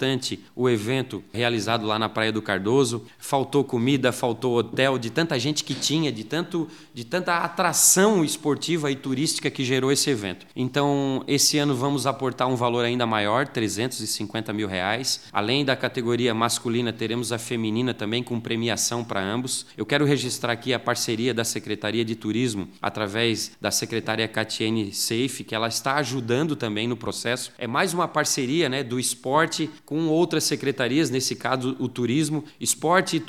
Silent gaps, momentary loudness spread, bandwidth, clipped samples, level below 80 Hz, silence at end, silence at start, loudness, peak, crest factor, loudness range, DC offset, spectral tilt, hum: none; 6 LU; 17 kHz; under 0.1%; -68 dBFS; 0 s; 0 s; -24 LUFS; -4 dBFS; 20 dB; 4 LU; 0.1%; -3.5 dB/octave; none